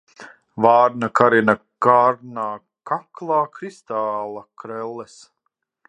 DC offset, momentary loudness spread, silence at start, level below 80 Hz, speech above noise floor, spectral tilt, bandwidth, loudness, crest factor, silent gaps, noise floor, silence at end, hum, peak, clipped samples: under 0.1%; 19 LU; 0.2 s; -66 dBFS; 56 dB; -6.5 dB/octave; 9.6 kHz; -19 LUFS; 20 dB; none; -75 dBFS; 0.85 s; none; 0 dBFS; under 0.1%